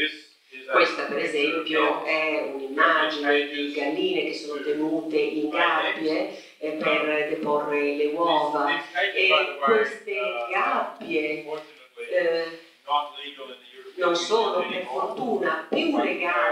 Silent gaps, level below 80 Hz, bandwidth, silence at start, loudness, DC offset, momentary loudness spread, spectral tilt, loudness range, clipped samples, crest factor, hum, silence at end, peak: none; -76 dBFS; 13 kHz; 0 s; -24 LUFS; under 0.1%; 13 LU; -3.5 dB/octave; 4 LU; under 0.1%; 20 dB; none; 0 s; -4 dBFS